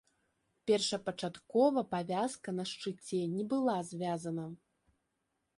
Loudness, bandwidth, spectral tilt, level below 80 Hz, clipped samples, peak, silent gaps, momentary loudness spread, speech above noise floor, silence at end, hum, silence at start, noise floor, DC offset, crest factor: -35 LUFS; 11.5 kHz; -5 dB/octave; -76 dBFS; under 0.1%; -16 dBFS; none; 11 LU; 49 dB; 1 s; none; 0.65 s; -83 dBFS; under 0.1%; 20 dB